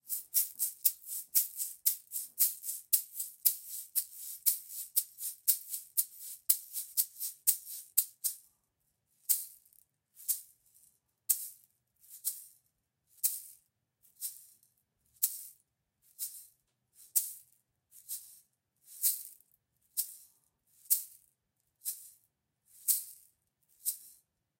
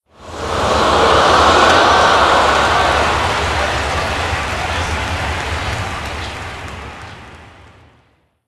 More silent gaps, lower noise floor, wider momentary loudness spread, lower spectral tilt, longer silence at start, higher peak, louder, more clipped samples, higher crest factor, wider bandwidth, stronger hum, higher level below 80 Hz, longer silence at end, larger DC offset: neither; first, -81 dBFS vs -56 dBFS; about the same, 16 LU vs 18 LU; second, 4.5 dB/octave vs -3.5 dB/octave; second, 0.05 s vs 0.2 s; second, -8 dBFS vs 0 dBFS; second, -33 LUFS vs -14 LUFS; neither; first, 30 dB vs 16 dB; first, 17 kHz vs 12 kHz; neither; second, -86 dBFS vs -30 dBFS; second, 0.5 s vs 1 s; neither